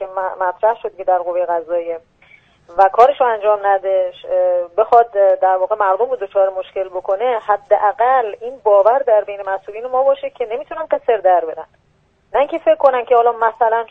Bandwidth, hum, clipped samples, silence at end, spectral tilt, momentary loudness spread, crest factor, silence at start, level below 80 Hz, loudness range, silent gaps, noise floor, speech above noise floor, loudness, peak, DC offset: 4.9 kHz; none; under 0.1%; 0.05 s; -5 dB/octave; 11 LU; 16 dB; 0 s; -58 dBFS; 3 LU; none; -58 dBFS; 42 dB; -16 LUFS; 0 dBFS; under 0.1%